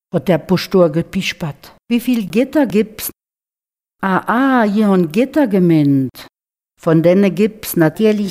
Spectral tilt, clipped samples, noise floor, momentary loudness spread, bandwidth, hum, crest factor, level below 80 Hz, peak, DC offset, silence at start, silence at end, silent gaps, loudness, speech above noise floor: -6.5 dB/octave; under 0.1%; under -90 dBFS; 10 LU; 16 kHz; none; 14 dB; -52 dBFS; 0 dBFS; under 0.1%; 0.15 s; 0 s; none; -15 LUFS; over 76 dB